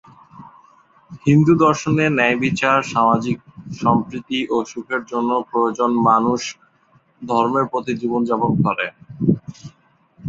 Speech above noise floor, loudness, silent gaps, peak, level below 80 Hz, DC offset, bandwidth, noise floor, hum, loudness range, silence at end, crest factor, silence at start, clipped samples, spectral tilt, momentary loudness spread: 39 dB; -18 LUFS; none; -2 dBFS; -54 dBFS; under 0.1%; 7.8 kHz; -57 dBFS; none; 4 LU; 0 s; 18 dB; 0.35 s; under 0.1%; -6.5 dB/octave; 10 LU